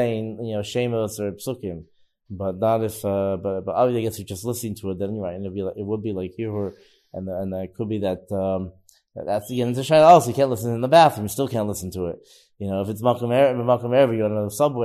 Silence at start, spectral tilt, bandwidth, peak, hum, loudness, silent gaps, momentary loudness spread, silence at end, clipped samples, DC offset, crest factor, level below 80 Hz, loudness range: 0 s; -6 dB/octave; 14 kHz; -2 dBFS; none; -22 LUFS; none; 15 LU; 0 s; under 0.1%; under 0.1%; 20 dB; -60 dBFS; 10 LU